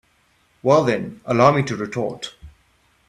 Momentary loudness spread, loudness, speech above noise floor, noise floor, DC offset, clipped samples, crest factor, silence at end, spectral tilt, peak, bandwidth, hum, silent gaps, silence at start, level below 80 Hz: 13 LU; -19 LUFS; 42 dB; -61 dBFS; under 0.1%; under 0.1%; 20 dB; 0.6 s; -6.5 dB/octave; 0 dBFS; 11.5 kHz; none; none; 0.65 s; -54 dBFS